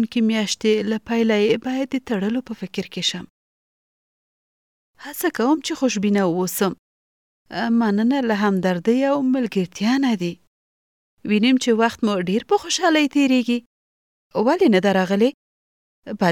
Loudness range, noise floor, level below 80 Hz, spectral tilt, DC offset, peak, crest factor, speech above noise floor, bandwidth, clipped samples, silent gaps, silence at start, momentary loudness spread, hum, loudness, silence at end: 6 LU; under -90 dBFS; -62 dBFS; -5 dB/octave; under 0.1%; -4 dBFS; 16 dB; over 71 dB; 18 kHz; under 0.1%; 3.30-4.94 s, 6.79-7.46 s, 10.47-11.17 s, 13.66-14.30 s, 15.34-16.02 s; 0 s; 10 LU; none; -20 LUFS; 0 s